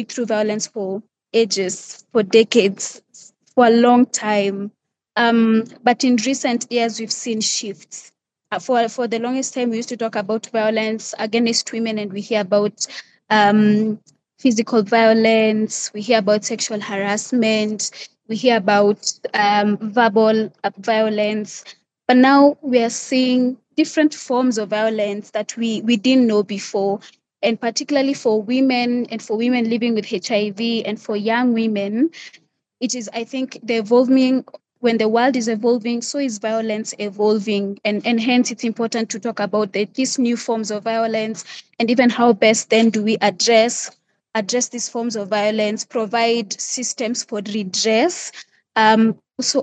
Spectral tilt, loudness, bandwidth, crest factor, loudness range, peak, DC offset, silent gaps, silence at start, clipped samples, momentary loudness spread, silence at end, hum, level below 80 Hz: -3.5 dB/octave; -18 LUFS; 9.2 kHz; 18 dB; 4 LU; 0 dBFS; under 0.1%; none; 0 s; under 0.1%; 11 LU; 0 s; none; -80 dBFS